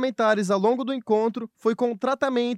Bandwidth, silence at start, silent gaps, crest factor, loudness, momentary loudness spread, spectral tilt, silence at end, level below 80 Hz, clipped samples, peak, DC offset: 12 kHz; 0 s; none; 14 dB; -24 LUFS; 5 LU; -5.5 dB/octave; 0 s; -78 dBFS; under 0.1%; -8 dBFS; under 0.1%